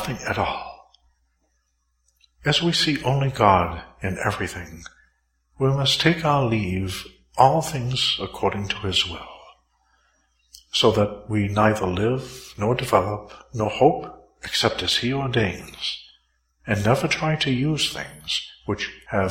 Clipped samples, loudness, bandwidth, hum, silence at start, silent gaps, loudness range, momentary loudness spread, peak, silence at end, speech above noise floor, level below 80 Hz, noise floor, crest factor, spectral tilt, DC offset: under 0.1%; -22 LUFS; 16.5 kHz; none; 0 s; none; 3 LU; 14 LU; 0 dBFS; 0 s; 48 dB; -48 dBFS; -70 dBFS; 24 dB; -5 dB/octave; under 0.1%